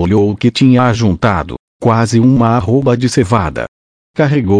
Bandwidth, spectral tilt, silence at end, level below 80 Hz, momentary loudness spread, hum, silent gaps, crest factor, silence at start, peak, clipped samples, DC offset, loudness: 10.5 kHz; -7 dB/octave; 0 s; -36 dBFS; 10 LU; none; 1.59-1.80 s, 3.68-4.14 s; 12 dB; 0 s; 0 dBFS; under 0.1%; under 0.1%; -12 LUFS